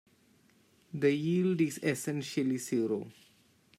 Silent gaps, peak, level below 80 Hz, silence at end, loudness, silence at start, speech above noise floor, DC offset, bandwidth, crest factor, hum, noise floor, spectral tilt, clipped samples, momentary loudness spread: none; -16 dBFS; -78 dBFS; 0.7 s; -32 LUFS; 0.95 s; 35 dB; under 0.1%; 16 kHz; 18 dB; none; -66 dBFS; -6 dB/octave; under 0.1%; 8 LU